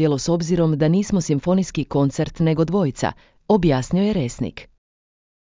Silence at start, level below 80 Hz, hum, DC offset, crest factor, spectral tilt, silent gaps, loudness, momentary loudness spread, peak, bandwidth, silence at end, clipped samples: 0 s; -42 dBFS; none; under 0.1%; 16 dB; -7 dB/octave; none; -20 LUFS; 8 LU; -4 dBFS; 7.6 kHz; 0.8 s; under 0.1%